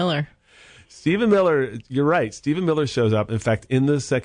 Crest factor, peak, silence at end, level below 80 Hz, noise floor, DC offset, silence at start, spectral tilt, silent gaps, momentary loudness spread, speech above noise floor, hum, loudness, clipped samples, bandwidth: 14 dB; -8 dBFS; 0 s; -54 dBFS; -50 dBFS; under 0.1%; 0 s; -6.5 dB/octave; none; 7 LU; 30 dB; none; -21 LUFS; under 0.1%; 10.5 kHz